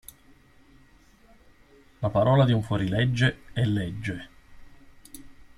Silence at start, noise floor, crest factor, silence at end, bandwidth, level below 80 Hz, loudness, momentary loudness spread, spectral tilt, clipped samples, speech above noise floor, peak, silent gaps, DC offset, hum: 2 s; -56 dBFS; 18 dB; 0.15 s; 15 kHz; -52 dBFS; -25 LUFS; 26 LU; -7 dB/octave; under 0.1%; 32 dB; -8 dBFS; none; under 0.1%; none